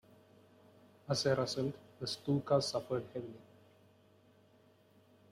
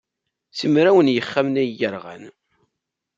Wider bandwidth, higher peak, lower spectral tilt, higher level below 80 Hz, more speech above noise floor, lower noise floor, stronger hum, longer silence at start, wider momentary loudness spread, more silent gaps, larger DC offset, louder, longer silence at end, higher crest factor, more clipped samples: first, 15 kHz vs 7.6 kHz; second, -18 dBFS vs -2 dBFS; second, -5 dB/octave vs -6.5 dB/octave; about the same, -72 dBFS vs -68 dBFS; second, 31 dB vs 62 dB; second, -67 dBFS vs -81 dBFS; neither; first, 1.1 s vs 0.55 s; second, 16 LU vs 19 LU; neither; neither; second, -36 LUFS vs -19 LUFS; first, 1.9 s vs 0.9 s; about the same, 22 dB vs 18 dB; neither